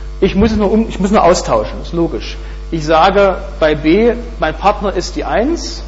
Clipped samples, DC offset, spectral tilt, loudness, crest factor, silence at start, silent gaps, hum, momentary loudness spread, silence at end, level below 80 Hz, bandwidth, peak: under 0.1%; under 0.1%; -5.5 dB/octave; -13 LUFS; 12 dB; 0 s; none; none; 10 LU; 0 s; -24 dBFS; 8 kHz; 0 dBFS